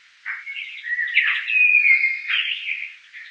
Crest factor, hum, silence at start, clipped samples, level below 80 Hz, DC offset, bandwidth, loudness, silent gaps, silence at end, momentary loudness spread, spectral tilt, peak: 18 dB; none; 0.25 s; under 0.1%; under -90 dBFS; under 0.1%; 8 kHz; -17 LUFS; none; 0 s; 17 LU; 5 dB/octave; -4 dBFS